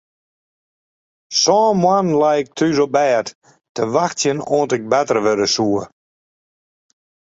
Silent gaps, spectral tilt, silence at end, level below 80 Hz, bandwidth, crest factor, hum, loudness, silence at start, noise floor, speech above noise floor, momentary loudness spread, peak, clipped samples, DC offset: 3.35-3.41 s, 3.69-3.75 s; -4 dB/octave; 1.5 s; -60 dBFS; 8 kHz; 16 dB; none; -17 LUFS; 1.3 s; under -90 dBFS; over 74 dB; 8 LU; -2 dBFS; under 0.1%; under 0.1%